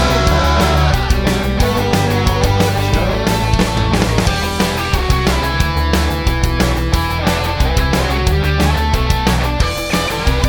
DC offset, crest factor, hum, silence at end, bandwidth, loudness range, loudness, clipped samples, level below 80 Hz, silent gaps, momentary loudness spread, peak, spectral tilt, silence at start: under 0.1%; 14 dB; none; 0 s; 19.5 kHz; 1 LU; -15 LUFS; under 0.1%; -18 dBFS; none; 3 LU; 0 dBFS; -5 dB/octave; 0 s